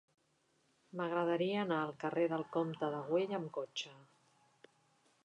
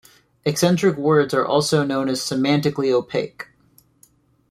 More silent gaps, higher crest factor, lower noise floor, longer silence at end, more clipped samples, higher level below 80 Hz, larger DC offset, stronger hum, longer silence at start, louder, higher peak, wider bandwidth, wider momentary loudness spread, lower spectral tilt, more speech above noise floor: neither; about the same, 18 dB vs 16 dB; first, -76 dBFS vs -57 dBFS; first, 1.2 s vs 1.05 s; neither; second, -88 dBFS vs -60 dBFS; neither; neither; first, 0.95 s vs 0.45 s; second, -37 LUFS vs -20 LUFS; second, -22 dBFS vs -4 dBFS; second, 9.6 kHz vs 16 kHz; about the same, 8 LU vs 9 LU; about the same, -6 dB/octave vs -5 dB/octave; about the same, 39 dB vs 38 dB